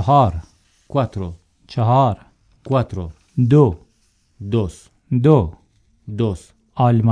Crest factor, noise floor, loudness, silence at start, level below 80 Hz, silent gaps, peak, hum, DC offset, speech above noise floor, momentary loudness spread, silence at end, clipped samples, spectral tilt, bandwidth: 18 dB; -60 dBFS; -18 LUFS; 0 s; -40 dBFS; none; 0 dBFS; none; under 0.1%; 44 dB; 18 LU; 0 s; under 0.1%; -9 dB/octave; 9.8 kHz